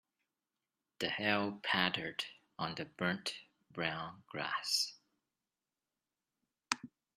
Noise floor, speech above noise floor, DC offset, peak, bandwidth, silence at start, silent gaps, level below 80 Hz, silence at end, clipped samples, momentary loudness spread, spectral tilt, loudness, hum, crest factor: under -90 dBFS; over 52 dB; under 0.1%; -10 dBFS; 14 kHz; 1 s; none; -78 dBFS; 0.3 s; under 0.1%; 11 LU; -3 dB/octave; -37 LUFS; none; 30 dB